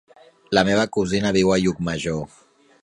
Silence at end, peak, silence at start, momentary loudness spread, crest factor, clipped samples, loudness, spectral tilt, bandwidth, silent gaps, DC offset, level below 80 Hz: 0.55 s; 0 dBFS; 0.5 s; 9 LU; 20 dB; under 0.1%; -21 LUFS; -5 dB/octave; 11.5 kHz; none; under 0.1%; -48 dBFS